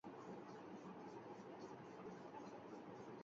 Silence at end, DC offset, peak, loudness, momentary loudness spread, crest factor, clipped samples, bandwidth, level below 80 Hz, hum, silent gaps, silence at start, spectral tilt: 0 s; under 0.1%; -42 dBFS; -56 LUFS; 1 LU; 12 dB; under 0.1%; 7.4 kHz; -88 dBFS; none; none; 0.05 s; -5.5 dB/octave